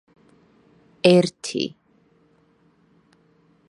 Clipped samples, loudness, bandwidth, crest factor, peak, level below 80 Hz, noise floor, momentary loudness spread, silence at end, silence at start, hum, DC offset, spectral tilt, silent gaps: under 0.1%; -20 LUFS; 11.5 kHz; 26 dB; 0 dBFS; -70 dBFS; -60 dBFS; 12 LU; 2 s; 1.05 s; none; under 0.1%; -5.5 dB/octave; none